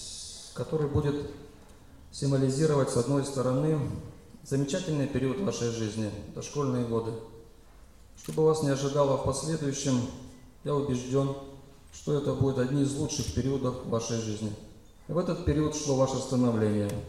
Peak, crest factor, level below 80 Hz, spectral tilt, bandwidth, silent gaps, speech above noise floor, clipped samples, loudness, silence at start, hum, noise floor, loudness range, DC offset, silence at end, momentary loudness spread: -14 dBFS; 16 dB; -50 dBFS; -6 dB/octave; 14 kHz; none; 25 dB; under 0.1%; -29 LUFS; 0 s; none; -53 dBFS; 3 LU; 0.1%; 0 s; 14 LU